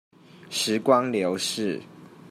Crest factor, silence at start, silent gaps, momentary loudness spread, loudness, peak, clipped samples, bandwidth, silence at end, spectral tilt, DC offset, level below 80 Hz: 20 dB; 0.35 s; none; 10 LU; -25 LUFS; -6 dBFS; under 0.1%; 16 kHz; 0 s; -3.5 dB/octave; under 0.1%; -76 dBFS